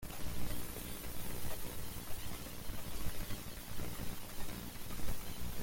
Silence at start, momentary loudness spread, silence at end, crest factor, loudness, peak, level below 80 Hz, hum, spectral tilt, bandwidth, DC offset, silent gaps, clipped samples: 0 s; 3 LU; 0 s; 14 dB; -45 LUFS; -24 dBFS; -48 dBFS; 60 Hz at -55 dBFS; -4 dB/octave; 17 kHz; under 0.1%; none; under 0.1%